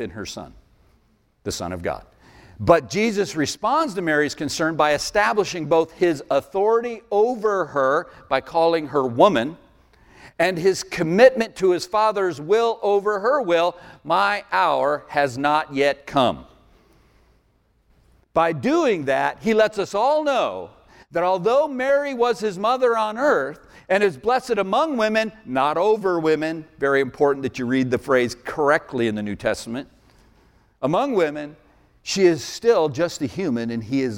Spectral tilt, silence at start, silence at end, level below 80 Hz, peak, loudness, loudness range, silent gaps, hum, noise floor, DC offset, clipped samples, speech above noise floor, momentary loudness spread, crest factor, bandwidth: -5 dB/octave; 0 s; 0 s; -54 dBFS; 0 dBFS; -21 LUFS; 5 LU; none; none; -62 dBFS; under 0.1%; under 0.1%; 42 dB; 8 LU; 20 dB; 16.5 kHz